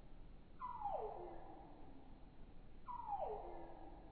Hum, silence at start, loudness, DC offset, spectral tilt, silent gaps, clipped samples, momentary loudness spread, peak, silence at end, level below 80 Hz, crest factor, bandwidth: none; 0 s; -50 LUFS; under 0.1%; -6 dB/octave; none; under 0.1%; 18 LU; -34 dBFS; 0 s; -60 dBFS; 16 dB; 4.5 kHz